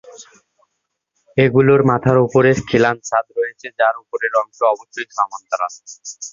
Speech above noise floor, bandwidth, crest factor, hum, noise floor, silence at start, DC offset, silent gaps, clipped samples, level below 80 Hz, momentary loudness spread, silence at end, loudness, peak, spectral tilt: 58 dB; 7.4 kHz; 18 dB; none; -75 dBFS; 0.2 s; under 0.1%; none; under 0.1%; -50 dBFS; 12 LU; 0.05 s; -17 LUFS; 0 dBFS; -6 dB/octave